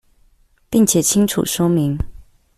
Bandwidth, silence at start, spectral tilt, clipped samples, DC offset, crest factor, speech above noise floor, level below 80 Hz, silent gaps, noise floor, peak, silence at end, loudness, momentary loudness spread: 16 kHz; 0.7 s; -5 dB/octave; under 0.1%; under 0.1%; 16 dB; 39 dB; -36 dBFS; none; -55 dBFS; -2 dBFS; 0.35 s; -17 LUFS; 10 LU